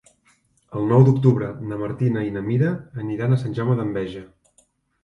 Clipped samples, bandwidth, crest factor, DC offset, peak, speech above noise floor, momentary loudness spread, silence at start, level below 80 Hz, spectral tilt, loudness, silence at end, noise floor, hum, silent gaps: under 0.1%; 6.2 kHz; 20 dB; under 0.1%; -2 dBFS; 42 dB; 14 LU; 0.7 s; -54 dBFS; -9.5 dB/octave; -21 LUFS; 0.8 s; -62 dBFS; none; none